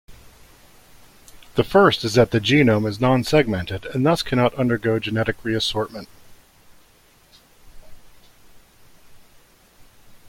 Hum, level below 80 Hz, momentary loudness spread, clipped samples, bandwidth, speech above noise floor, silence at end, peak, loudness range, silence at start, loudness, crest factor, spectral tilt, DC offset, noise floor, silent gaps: none; -48 dBFS; 11 LU; under 0.1%; 16.5 kHz; 35 dB; 0.15 s; -2 dBFS; 11 LU; 0.1 s; -19 LUFS; 20 dB; -6 dB/octave; under 0.1%; -54 dBFS; none